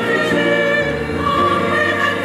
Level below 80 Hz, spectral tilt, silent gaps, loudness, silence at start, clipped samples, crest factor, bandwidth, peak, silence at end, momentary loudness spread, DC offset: -42 dBFS; -5 dB/octave; none; -16 LUFS; 0 s; under 0.1%; 12 dB; 15.5 kHz; -4 dBFS; 0 s; 3 LU; under 0.1%